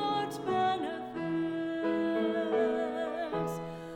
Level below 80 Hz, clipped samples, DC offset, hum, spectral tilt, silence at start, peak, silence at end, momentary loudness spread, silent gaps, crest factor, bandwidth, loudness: -66 dBFS; under 0.1%; under 0.1%; none; -6 dB/octave; 0 s; -18 dBFS; 0 s; 6 LU; none; 14 dB; 16 kHz; -32 LUFS